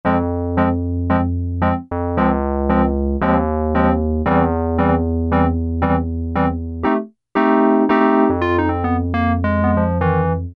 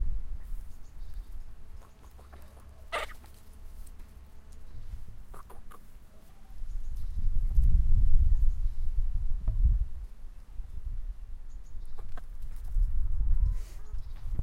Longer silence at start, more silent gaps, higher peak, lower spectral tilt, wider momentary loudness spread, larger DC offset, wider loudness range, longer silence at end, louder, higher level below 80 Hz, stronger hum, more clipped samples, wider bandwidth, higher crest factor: about the same, 0.05 s vs 0 s; neither; first, 0 dBFS vs -8 dBFS; first, -10.5 dB/octave vs -6.5 dB/octave; second, 6 LU vs 24 LU; neither; second, 2 LU vs 16 LU; about the same, 0 s vs 0 s; first, -18 LUFS vs -35 LUFS; about the same, -28 dBFS vs -30 dBFS; neither; neither; first, 4.8 kHz vs 4.2 kHz; about the same, 16 dB vs 18 dB